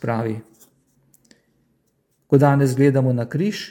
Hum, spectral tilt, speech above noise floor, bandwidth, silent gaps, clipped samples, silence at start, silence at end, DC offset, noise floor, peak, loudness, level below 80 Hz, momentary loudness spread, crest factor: none; -7.5 dB/octave; 49 dB; 16.5 kHz; none; under 0.1%; 0 s; 0 s; under 0.1%; -67 dBFS; -2 dBFS; -19 LUFS; -64 dBFS; 10 LU; 20 dB